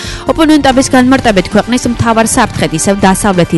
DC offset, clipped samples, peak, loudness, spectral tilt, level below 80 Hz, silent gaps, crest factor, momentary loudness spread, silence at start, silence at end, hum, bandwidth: under 0.1%; 0.8%; 0 dBFS; -9 LUFS; -4.5 dB/octave; -28 dBFS; none; 8 dB; 5 LU; 0 s; 0 s; none; 12 kHz